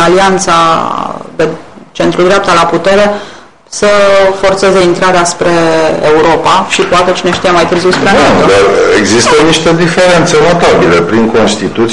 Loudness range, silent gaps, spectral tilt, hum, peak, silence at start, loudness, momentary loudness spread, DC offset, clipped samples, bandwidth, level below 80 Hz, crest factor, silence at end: 3 LU; none; -4 dB/octave; none; 0 dBFS; 0 s; -7 LUFS; 7 LU; 4%; under 0.1%; 11 kHz; -34 dBFS; 8 dB; 0 s